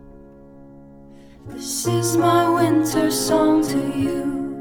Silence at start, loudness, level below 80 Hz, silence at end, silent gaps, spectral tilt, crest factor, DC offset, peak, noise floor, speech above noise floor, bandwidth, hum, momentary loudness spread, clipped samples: 0.05 s; -19 LUFS; -48 dBFS; 0 s; none; -5 dB/octave; 16 dB; under 0.1%; -4 dBFS; -44 dBFS; 25 dB; 19 kHz; none; 9 LU; under 0.1%